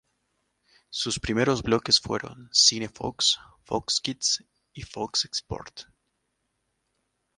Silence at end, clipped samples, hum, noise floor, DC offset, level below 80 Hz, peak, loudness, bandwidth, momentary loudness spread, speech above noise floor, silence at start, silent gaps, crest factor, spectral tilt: 1.55 s; under 0.1%; none; -77 dBFS; under 0.1%; -52 dBFS; -6 dBFS; -24 LUFS; 11.5 kHz; 18 LU; 50 dB; 0.9 s; none; 24 dB; -2.5 dB/octave